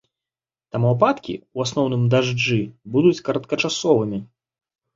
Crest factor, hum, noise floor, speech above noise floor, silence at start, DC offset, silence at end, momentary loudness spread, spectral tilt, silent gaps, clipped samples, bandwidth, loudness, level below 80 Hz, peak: 20 dB; none; under -90 dBFS; over 70 dB; 0.75 s; under 0.1%; 0.7 s; 10 LU; -6 dB/octave; none; under 0.1%; 7.8 kHz; -21 LUFS; -58 dBFS; -2 dBFS